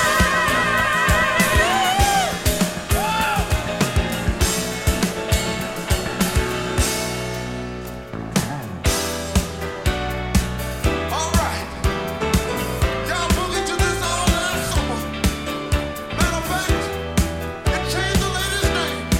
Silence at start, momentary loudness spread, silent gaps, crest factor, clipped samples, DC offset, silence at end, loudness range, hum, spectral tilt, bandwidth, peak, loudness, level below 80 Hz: 0 s; 8 LU; none; 18 dB; under 0.1%; under 0.1%; 0 s; 5 LU; none; -4 dB/octave; 17 kHz; -2 dBFS; -21 LUFS; -28 dBFS